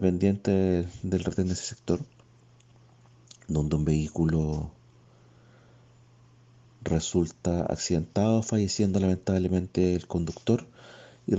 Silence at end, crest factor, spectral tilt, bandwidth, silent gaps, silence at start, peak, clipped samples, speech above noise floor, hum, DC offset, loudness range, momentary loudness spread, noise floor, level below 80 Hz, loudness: 0 s; 18 dB; -6.5 dB/octave; 8.2 kHz; none; 0 s; -10 dBFS; under 0.1%; 31 dB; none; under 0.1%; 6 LU; 7 LU; -57 dBFS; -48 dBFS; -27 LUFS